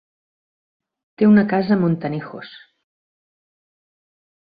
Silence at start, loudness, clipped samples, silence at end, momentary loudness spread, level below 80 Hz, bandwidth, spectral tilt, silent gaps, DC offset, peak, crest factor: 1.2 s; -17 LUFS; under 0.1%; 1.95 s; 21 LU; -62 dBFS; 5 kHz; -11.5 dB/octave; none; under 0.1%; -4 dBFS; 18 dB